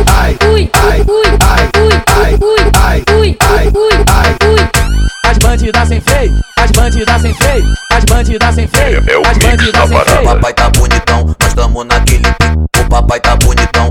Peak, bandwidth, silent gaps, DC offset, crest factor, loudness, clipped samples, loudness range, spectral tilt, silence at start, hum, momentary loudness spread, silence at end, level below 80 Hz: 0 dBFS; 18 kHz; none; under 0.1%; 8 dB; -9 LUFS; 0.2%; 2 LU; -4.5 dB/octave; 0 s; none; 3 LU; 0 s; -10 dBFS